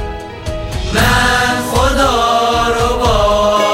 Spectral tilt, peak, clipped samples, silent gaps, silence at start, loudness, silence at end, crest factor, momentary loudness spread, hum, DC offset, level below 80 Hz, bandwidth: -4 dB/octave; 0 dBFS; under 0.1%; none; 0 s; -12 LUFS; 0 s; 12 dB; 12 LU; none; under 0.1%; -22 dBFS; 16.5 kHz